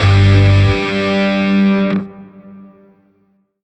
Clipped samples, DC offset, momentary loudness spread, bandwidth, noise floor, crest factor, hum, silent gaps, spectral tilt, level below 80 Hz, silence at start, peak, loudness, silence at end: under 0.1%; under 0.1%; 8 LU; 8.4 kHz; -58 dBFS; 12 dB; none; none; -7.5 dB/octave; -32 dBFS; 0 s; -2 dBFS; -13 LUFS; 1.05 s